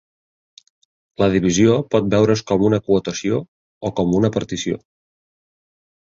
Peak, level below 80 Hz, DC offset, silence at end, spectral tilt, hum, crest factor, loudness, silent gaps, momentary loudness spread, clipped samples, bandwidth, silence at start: -2 dBFS; -46 dBFS; under 0.1%; 1.25 s; -6 dB/octave; none; 18 dB; -18 LUFS; 3.48-3.81 s; 10 LU; under 0.1%; 7.8 kHz; 1.2 s